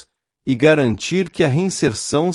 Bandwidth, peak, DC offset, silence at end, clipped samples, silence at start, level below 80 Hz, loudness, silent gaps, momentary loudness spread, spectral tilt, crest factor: 12 kHz; -2 dBFS; under 0.1%; 0 s; under 0.1%; 0.45 s; -50 dBFS; -18 LUFS; none; 7 LU; -5.5 dB/octave; 16 dB